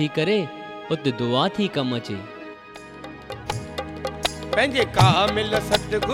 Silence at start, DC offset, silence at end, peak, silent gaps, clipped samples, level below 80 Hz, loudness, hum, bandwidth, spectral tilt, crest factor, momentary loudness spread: 0 s; under 0.1%; 0 s; -2 dBFS; none; under 0.1%; -44 dBFS; -23 LUFS; none; 17.5 kHz; -5 dB/octave; 22 dB; 21 LU